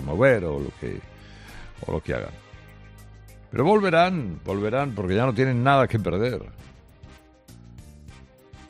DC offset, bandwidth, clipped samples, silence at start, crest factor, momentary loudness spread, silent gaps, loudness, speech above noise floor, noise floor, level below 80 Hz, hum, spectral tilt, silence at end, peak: under 0.1%; 13.5 kHz; under 0.1%; 0 s; 20 dB; 19 LU; none; -23 LUFS; 26 dB; -49 dBFS; -46 dBFS; none; -7.5 dB/octave; 0.05 s; -4 dBFS